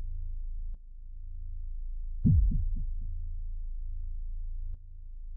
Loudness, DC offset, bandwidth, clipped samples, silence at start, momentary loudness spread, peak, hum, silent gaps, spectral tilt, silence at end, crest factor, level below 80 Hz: -36 LUFS; under 0.1%; 0.6 kHz; under 0.1%; 0 s; 21 LU; -14 dBFS; none; none; -14.5 dB/octave; 0 s; 18 dB; -34 dBFS